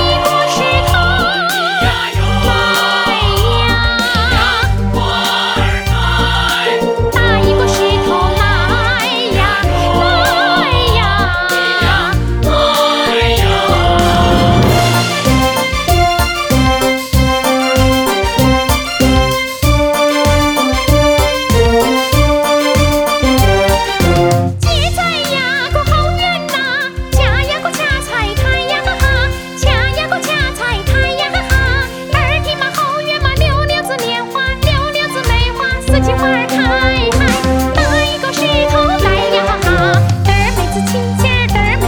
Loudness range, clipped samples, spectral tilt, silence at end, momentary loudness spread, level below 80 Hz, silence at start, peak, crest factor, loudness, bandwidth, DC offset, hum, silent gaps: 3 LU; under 0.1%; -4.5 dB/octave; 0 s; 4 LU; -20 dBFS; 0 s; 0 dBFS; 12 dB; -12 LUFS; over 20 kHz; under 0.1%; none; none